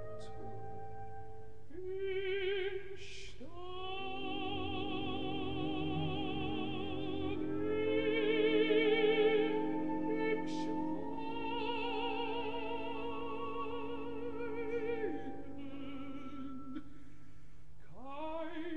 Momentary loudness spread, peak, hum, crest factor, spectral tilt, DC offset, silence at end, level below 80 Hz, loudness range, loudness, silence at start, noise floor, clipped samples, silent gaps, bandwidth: 18 LU; -18 dBFS; none; 18 dB; -6.5 dB/octave; 0.9%; 0 s; -60 dBFS; 10 LU; -37 LUFS; 0 s; -59 dBFS; under 0.1%; none; 8.6 kHz